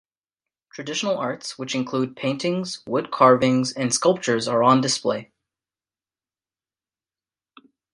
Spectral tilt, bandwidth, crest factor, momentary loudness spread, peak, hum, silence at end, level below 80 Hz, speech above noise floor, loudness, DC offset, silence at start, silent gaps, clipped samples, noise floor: -4.5 dB/octave; 11.5 kHz; 22 dB; 11 LU; -2 dBFS; none; 2.7 s; -66 dBFS; over 69 dB; -22 LUFS; under 0.1%; 0.75 s; none; under 0.1%; under -90 dBFS